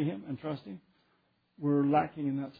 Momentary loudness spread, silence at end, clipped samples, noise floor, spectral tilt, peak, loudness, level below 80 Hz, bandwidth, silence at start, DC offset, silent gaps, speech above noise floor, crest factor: 17 LU; 0.1 s; under 0.1%; -73 dBFS; -11 dB/octave; -14 dBFS; -32 LUFS; -74 dBFS; 4.9 kHz; 0 s; under 0.1%; none; 41 dB; 18 dB